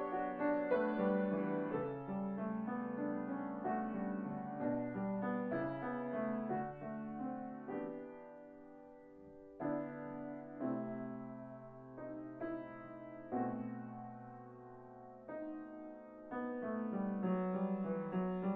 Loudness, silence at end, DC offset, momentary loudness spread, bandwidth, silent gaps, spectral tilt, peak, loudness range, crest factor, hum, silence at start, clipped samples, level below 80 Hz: -41 LUFS; 0 s; under 0.1%; 17 LU; 4.3 kHz; none; -8 dB/octave; -22 dBFS; 8 LU; 18 dB; none; 0 s; under 0.1%; -72 dBFS